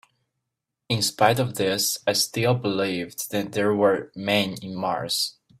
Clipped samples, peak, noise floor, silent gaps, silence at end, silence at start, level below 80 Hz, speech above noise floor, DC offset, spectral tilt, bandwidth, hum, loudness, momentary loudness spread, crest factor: under 0.1%; -2 dBFS; -83 dBFS; none; 0.3 s; 0.9 s; -64 dBFS; 59 dB; under 0.1%; -4 dB/octave; 16 kHz; none; -24 LUFS; 8 LU; 22 dB